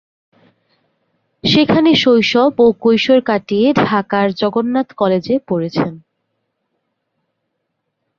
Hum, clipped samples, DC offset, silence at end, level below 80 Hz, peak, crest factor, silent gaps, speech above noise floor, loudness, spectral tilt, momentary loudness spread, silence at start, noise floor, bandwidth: none; under 0.1%; under 0.1%; 2.2 s; -52 dBFS; -2 dBFS; 14 dB; none; 59 dB; -14 LUFS; -6 dB/octave; 8 LU; 1.45 s; -72 dBFS; 7.2 kHz